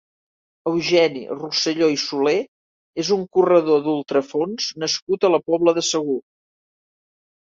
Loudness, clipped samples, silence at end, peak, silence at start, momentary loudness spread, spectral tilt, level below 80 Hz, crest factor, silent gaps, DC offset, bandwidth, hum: -20 LUFS; under 0.1%; 1.4 s; -4 dBFS; 0.65 s; 10 LU; -4 dB/octave; -66 dBFS; 18 dB; 2.48-2.93 s, 5.02-5.07 s; under 0.1%; 7.8 kHz; none